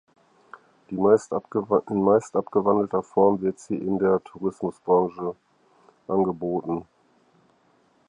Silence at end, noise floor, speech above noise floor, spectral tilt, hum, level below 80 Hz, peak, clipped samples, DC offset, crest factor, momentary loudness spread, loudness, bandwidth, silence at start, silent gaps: 1.25 s; -63 dBFS; 40 dB; -8.5 dB/octave; none; -62 dBFS; -6 dBFS; under 0.1%; under 0.1%; 20 dB; 11 LU; -24 LUFS; 10 kHz; 0.9 s; none